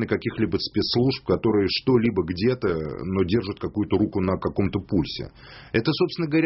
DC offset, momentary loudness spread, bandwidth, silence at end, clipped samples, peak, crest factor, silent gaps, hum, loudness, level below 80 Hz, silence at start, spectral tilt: under 0.1%; 7 LU; 6 kHz; 0 s; under 0.1%; -6 dBFS; 16 dB; none; none; -24 LUFS; -46 dBFS; 0 s; -5.5 dB/octave